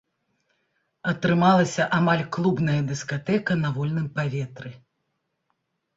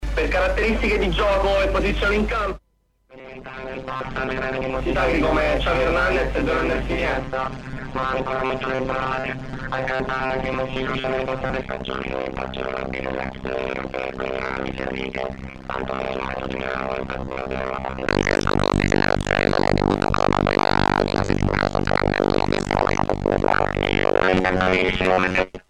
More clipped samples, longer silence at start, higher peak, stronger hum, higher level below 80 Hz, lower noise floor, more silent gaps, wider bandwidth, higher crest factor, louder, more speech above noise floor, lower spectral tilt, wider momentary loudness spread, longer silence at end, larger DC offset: neither; first, 1.05 s vs 0 s; about the same, -6 dBFS vs -4 dBFS; neither; second, -60 dBFS vs -32 dBFS; first, -77 dBFS vs -59 dBFS; neither; second, 7.8 kHz vs 11.5 kHz; about the same, 18 dB vs 18 dB; about the same, -23 LUFS vs -22 LUFS; first, 54 dB vs 37 dB; about the same, -6.5 dB/octave vs -6 dB/octave; first, 13 LU vs 9 LU; first, 1.2 s vs 0.1 s; neither